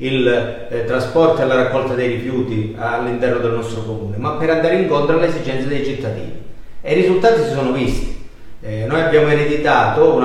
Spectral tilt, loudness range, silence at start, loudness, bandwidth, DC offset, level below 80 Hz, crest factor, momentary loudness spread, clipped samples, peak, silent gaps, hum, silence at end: -7 dB/octave; 3 LU; 0 s; -17 LUFS; 11.5 kHz; under 0.1%; -34 dBFS; 14 dB; 11 LU; under 0.1%; -2 dBFS; none; none; 0 s